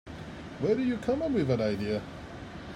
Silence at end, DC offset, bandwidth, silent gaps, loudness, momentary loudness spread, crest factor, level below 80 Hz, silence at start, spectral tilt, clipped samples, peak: 0 s; under 0.1%; 11.5 kHz; none; -30 LUFS; 15 LU; 16 dB; -54 dBFS; 0.05 s; -7.5 dB/octave; under 0.1%; -14 dBFS